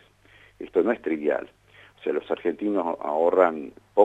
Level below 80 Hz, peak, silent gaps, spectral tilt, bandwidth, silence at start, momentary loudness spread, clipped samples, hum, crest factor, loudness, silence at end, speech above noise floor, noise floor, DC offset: -66 dBFS; -4 dBFS; none; -7.5 dB/octave; 8 kHz; 0.6 s; 12 LU; under 0.1%; none; 22 dB; -25 LUFS; 0 s; 32 dB; -55 dBFS; under 0.1%